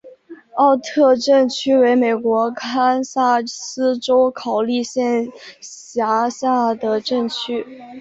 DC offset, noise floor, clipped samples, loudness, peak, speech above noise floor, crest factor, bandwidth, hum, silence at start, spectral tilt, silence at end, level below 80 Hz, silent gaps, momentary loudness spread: under 0.1%; -41 dBFS; under 0.1%; -18 LUFS; -2 dBFS; 23 dB; 16 dB; 8 kHz; none; 0.05 s; -3.5 dB/octave; 0 s; -64 dBFS; none; 12 LU